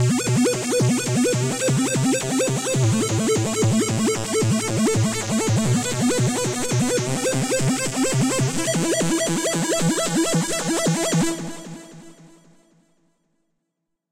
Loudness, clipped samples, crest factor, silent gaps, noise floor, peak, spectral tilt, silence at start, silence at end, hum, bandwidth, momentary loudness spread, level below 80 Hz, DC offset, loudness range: -21 LUFS; under 0.1%; 12 dB; none; -78 dBFS; -10 dBFS; -4.5 dB/octave; 0 s; 1.85 s; none; 16 kHz; 2 LU; -52 dBFS; under 0.1%; 4 LU